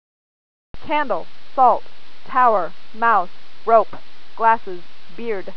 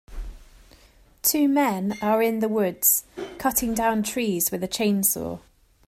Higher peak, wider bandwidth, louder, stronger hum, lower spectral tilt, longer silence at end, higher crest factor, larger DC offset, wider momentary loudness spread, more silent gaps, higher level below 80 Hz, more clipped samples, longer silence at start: first, 0 dBFS vs -6 dBFS; second, 5.4 kHz vs 16 kHz; first, -19 LUFS vs -23 LUFS; neither; first, -6.5 dB/octave vs -3.5 dB/octave; second, 0.05 s vs 0.5 s; about the same, 20 dB vs 18 dB; first, 7% vs under 0.1%; about the same, 15 LU vs 16 LU; neither; second, -62 dBFS vs -46 dBFS; neither; first, 0.85 s vs 0.1 s